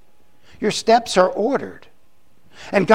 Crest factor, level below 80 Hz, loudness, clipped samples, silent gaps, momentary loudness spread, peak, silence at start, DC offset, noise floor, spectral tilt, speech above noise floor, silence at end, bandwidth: 20 dB; -56 dBFS; -19 LUFS; under 0.1%; none; 14 LU; 0 dBFS; 0.6 s; 0.7%; -61 dBFS; -4.5 dB/octave; 44 dB; 0 s; 16 kHz